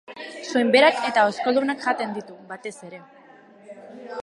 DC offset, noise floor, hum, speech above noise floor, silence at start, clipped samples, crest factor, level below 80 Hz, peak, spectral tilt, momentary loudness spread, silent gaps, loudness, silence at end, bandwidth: under 0.1%; -49 dBFS; none; 28 dB; 0.1 s; under 0.1%; 20 dB; -74 dBFS; -2 dBFS; -3.5 dB/octave; 24 LU; none; -20 LUFS; 0 s; 11.5 kHz